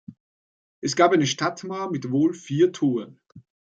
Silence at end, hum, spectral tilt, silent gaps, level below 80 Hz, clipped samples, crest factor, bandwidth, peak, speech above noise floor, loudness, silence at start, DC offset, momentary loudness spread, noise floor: 0.4 s; none; -5 dB/octave; 0.20-0.82 s; -70 dBFS; under 0.1%; 20 dB; 9 kHz; -4 dBFS; over 68 dB; -23 LUFS; 0.1 s; under 0.1%; 12 LU; under -90 dBFS